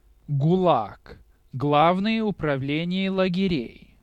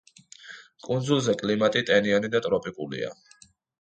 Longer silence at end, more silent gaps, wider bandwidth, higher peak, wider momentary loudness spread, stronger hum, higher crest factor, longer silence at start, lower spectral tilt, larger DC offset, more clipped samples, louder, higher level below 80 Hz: second, 0.3 s vs 0.65 s; neither; second, 7.6 kHz vs 9 kHz; about the same, -6 dBFS vs -8 dBFS; second, 10 LU vs 21 LU; neither; about the same, 18 dB vs 20 dB; second, 0.3 s vs 0.45 s; first, -8.5 dB/octave vs -5 dB/octave; neither; neither; about the same, -23 LUFS vs -25 LUFS; first, -52 dBFS vs -64 dBFS